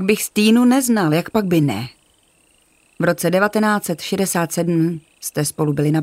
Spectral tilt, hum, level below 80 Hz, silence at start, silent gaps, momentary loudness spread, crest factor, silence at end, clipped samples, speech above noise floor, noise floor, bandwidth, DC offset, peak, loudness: -5 dB/octave; none; -56 dBFS; 0 s; none; 8 LU; 16 dB; 0 s; under 0.1%; 40 dB; -57 dBFS; 16 kHz; under 0.1%; -2 dBFS; -18 LUFS